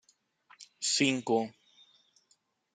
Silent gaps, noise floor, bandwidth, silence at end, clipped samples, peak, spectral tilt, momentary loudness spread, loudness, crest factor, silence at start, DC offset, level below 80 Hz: none; -73 dBFS; 9.6 kHz; 1.25 s; under 0.1%; -12 dBFS; -2.5 dB/octave; 9 LU; -30 LUFS; 24 dB; 0.6 s; under 0.1%; -82 dBFS